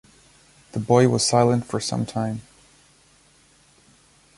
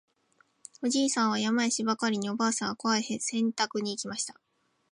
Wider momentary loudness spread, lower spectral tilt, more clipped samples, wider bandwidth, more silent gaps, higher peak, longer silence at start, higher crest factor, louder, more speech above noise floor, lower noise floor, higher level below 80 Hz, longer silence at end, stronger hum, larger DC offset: first, 14 LU vs 7 LU; first, -5 dB/octave vs -3 dB/octave; neither; about the same, 11.5 kHz vs 11.5 kHz; neither; first, -2 dBFS vs -12 dBFS; about the same, 0.75 s vs 0.8 s; about the same, 22 dB vs 18 dB; first, -21 LUFS vs -29 LUFS; about the same, 36 dB vs 39 dB; second, -57 dBFS vs -68 dBFS; first, -56 dBFS vs -78 dBFS; first, 1.95 s vs 0.6 s; neither; neither